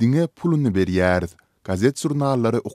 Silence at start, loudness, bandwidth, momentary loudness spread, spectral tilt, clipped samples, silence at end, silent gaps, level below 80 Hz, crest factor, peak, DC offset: 0 s; -21 LUFS; 14.5 kHz; 8 LU; -7 dB/octave; under 0.1%; 0 s; none; -48 dBFS; 16 dB; -4 dBFS; under 0.1%